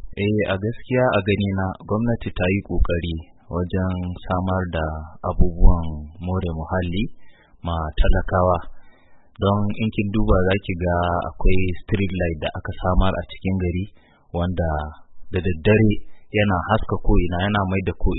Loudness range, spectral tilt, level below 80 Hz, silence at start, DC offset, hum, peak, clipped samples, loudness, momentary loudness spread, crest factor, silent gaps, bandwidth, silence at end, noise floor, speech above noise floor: 3 LU; -12 dB/octave; -26 dBFS; 0 s; under 0.1%; none; 0 dBFS; under 0.1%; -23 LUFS; 9 LU; 20 dB; none; 4.1 kHz; 0 s; -47 dBFS; 27 dB